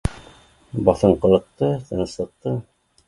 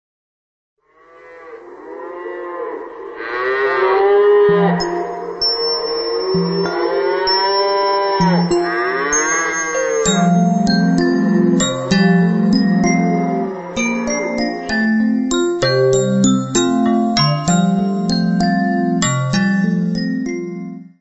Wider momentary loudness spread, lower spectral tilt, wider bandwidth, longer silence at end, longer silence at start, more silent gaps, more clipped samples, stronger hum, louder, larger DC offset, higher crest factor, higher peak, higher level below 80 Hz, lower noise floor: about the same, 13 LU vs 12 LU; first, -8 dB/octave vs -5 dB/octave; first, 11.5 kHz vs 8.4 kHz; first, 0.45 s vs 0.2 s; second, 0.05 s vs 1.25 s; neither; neither; neither; second, -21 LUFS vs -16 LUFS; neither; first, 20 dB vs 14 dB; about the same, 0 dBFS vs -2 dBFS; first, -38 dBFS vs -46 dBFS; first, -49 dBFS vs -45 dBFS